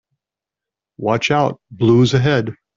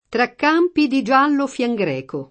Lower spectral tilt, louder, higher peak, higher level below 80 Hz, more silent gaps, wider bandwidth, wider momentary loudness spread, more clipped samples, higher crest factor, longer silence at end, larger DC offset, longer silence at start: about the same, -6.5 dB/octave vs -5.5 dB/octave; about the same, -16 LUFS vs -18 LUFS; about the same, -2 dBFS vs -2 dBFS; first, -50 dBFS vs -62 dBFS; neither; second, 7.6 kHz vs 8.8 kHz; about the same, 8 LU vs 7 LU; neither; about the same, 16 dB vs 16 dB; first, 0.25 s vs 0.05 s; neither; first, 1 s vs 0.1 s